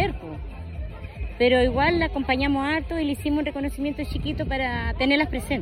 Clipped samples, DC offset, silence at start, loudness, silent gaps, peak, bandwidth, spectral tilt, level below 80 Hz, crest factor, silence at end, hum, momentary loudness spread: under 0.1%; under 0.1%; 0 s; -24 LUFS; none; -8 dBFS; 16 kHz; -6.5 dB/octave; -34 dBFS; 16 dB; 0 s; none; 16 LU